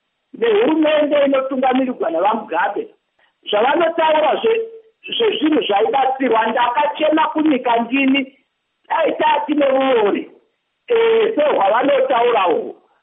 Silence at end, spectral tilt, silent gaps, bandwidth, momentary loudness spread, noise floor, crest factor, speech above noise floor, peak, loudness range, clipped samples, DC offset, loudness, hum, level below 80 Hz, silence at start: 0.3 s; -1 dB/octave; none; 3.9 kHz; 7 LU; -63 dBFS; 12 dB; 47 dB; -4 dBFS; 2 LU; under 0.1%; under 0.1%; -16 LUFS; none; -76 dBFS; 0.35 s